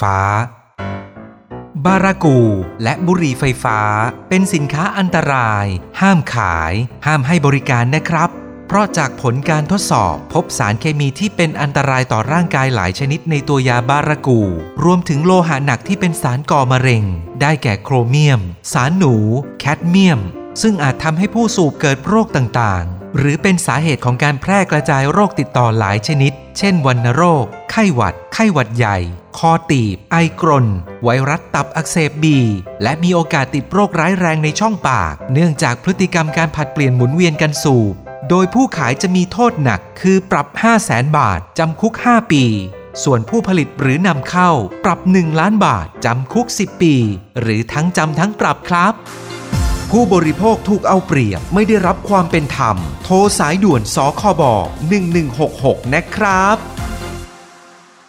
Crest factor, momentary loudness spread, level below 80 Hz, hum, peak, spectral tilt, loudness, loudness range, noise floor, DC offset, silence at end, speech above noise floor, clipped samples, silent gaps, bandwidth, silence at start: 14 dB; 6 LU; -36 dBFS; none; 0 dBFS; -6 dB/octave; -14 LUFS; 2 LU; -43 dBFS; under 0.1%; 0.65 s; 29 dB; under 0.1%; none; 14.5 kHz; 0 s